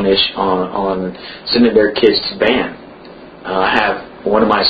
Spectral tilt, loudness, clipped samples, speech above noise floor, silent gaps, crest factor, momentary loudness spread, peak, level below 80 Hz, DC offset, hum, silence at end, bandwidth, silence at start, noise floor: -7 dB/octave; -15 LUFS; under 0.1%; 22 dB; none; 14 dB; 13 LU; 0 dBFS; -44 dBFS; under 0.1%; none; 0 s; 6.6 kHz; 0 s; -36 dBFS